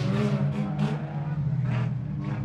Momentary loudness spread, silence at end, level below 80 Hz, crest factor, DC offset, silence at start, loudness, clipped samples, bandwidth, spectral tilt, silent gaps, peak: 5 LU; 0 s; -50 dBFS; 12 dB; under 0.1%; 0 s; -28 LUFS; under 0.1%; 8.4 kHz; -8.5 dB/octave; none; -14 dBFS